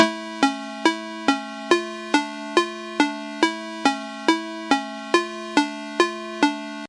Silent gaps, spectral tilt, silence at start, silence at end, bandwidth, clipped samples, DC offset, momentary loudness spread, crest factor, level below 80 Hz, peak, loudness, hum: none; -2.5 dB/octave; 0 s; 0 s; 11.5 kHz; under 0.1%; under 0.1%; 1 LU; 22 dB; -74 dBFS; 0 dBFS; -23 LUFS; none